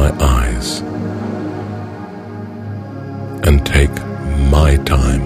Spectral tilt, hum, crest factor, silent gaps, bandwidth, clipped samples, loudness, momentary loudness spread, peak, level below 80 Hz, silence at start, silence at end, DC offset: -6 dB/octave; none; 16 dB; none; 16 kHz; under 0.1%; -17 LUFS; 15 LU; 0 dBFS; -18 dBFS; 0 s; 0 s; under 0.1%